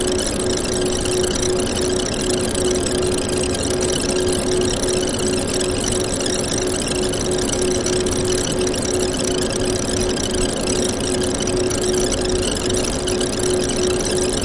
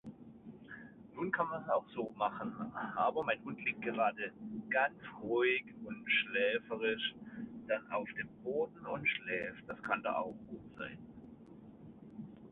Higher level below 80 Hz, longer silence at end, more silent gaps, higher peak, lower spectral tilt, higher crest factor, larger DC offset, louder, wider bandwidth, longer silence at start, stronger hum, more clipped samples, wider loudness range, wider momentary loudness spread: first, -32 dBFS vs -72 dBFS; about the same, 0 s vs 0 s; neither; first, -4 dBFS vs -18 dBFS; first, -3.5 dB/octave vs -2 dB/octave; second, 14 dB vs 20 dB; first, 0.2% vs under 0.1%; first, -19 LUFS vs -37 LUFS; first, 11.5 kHz vs 4 kHz; about the same, 0 s vs 0.05 s; neither; neither; second, 0 LU vs 5 LU; second, 1 LU vs 20 LU